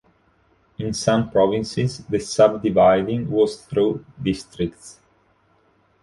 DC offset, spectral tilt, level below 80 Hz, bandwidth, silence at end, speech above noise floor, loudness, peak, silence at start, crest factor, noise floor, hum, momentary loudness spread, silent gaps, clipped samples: under 0.1%; -6 dB/octave; -50 dBFS; 11.5 kHz; 1.1 s; 41 dB; -21 LUFS; -2 dBFS; 0.8 s; 20 dB; -61 dBFS; none; 11 LU; none; under 0.1%